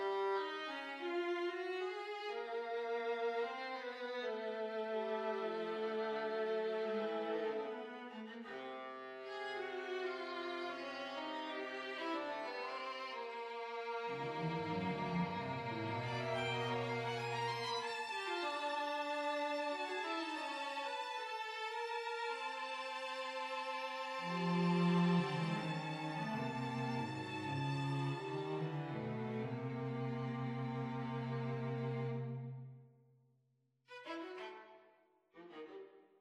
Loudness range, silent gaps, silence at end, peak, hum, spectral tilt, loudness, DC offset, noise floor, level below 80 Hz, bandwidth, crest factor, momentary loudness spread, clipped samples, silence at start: 7 LU; none; 0.2 s; -24 dBFS; none; -6 dB/octave; -41 LUFS; under 0.1%; -79 dBFS; -80 dBFS; 11.5 kHz; 18 dB; 9 LU; under 0.1%; 0 s